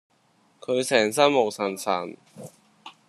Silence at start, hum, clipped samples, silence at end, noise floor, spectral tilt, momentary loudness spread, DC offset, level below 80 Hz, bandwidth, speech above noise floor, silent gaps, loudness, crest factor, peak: 0.7 s; none; under 0.1%; 0.2 s; -63 dBFS; -3.5 dB/octave; 24 LU; under 0.1%; -74 dBFS; 13 kHz; 40 dB; none; -23 LUFS; 22 dB; -4 dBFS